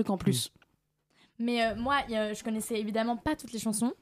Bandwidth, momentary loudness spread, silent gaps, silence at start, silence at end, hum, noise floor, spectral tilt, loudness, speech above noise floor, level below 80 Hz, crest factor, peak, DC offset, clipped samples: 15.5 kHz; 5 LU; none; 0 s; 0.05 s; none; -74 dBFS; -4.5 dB/octave; -31 LUFS; 44 dB; -56 dBFS; 18 dB; -14 dBFS; under 0.1%; under 0.1%